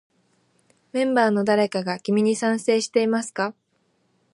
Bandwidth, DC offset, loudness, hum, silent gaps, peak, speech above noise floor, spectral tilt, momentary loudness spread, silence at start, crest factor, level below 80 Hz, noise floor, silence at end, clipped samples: 11.5 kHz; under 0.1%; -22 LUFS; none; none; -6 dBFS; 46 dB; -5 dB/octave; 8 LU; 0.95 s; 18 dB; -74 dBFS; -68 dBFS; 0.85 s; under 0.1%